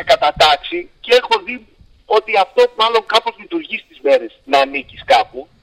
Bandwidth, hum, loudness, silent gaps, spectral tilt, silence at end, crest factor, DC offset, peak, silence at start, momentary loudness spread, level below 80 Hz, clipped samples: 16 kHz; none; -15 LUFS; none; -2.5 dB/octave; 0.2 s; 16 dB; under 0.1%; 0 dBFS; 0 s; 13 LU; -48 dBFS; under 0.1%